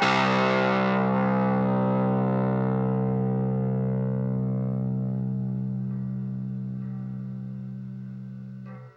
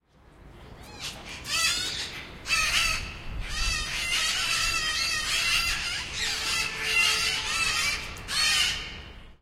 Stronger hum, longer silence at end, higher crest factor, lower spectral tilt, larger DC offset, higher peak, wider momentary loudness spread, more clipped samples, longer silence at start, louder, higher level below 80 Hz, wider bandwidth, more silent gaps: neither; about the same, 0.05 s vs 0.1 s; about the same, 18 dB vs 18 dB; first, -8 dB/octave vs 0 dB/octave; neither; about the same, -8 dBFS vs -10 dBFS; about the same, 14 LU vs 15 LU; neither; second, 0 s vs 0.35 s; about the same, -26 LUFS vs -25 LUFS; second, -60 dBFS vs -42 dBFS; second, 7.6 kHz vs 16.5 kHz; neither